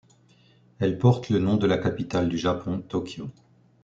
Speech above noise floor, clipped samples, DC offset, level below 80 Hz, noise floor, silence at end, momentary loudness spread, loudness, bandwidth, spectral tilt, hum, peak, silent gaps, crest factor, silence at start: 34 dB; under 0.1%; under 0.1%; -56 dBFS; -58 dBFS; 0.5 s; 11 LU; -25 LUFS; 7.8 kHz; -7.5 dB/octave; none; -6 dBFS; none; 20 dB; 0.8 s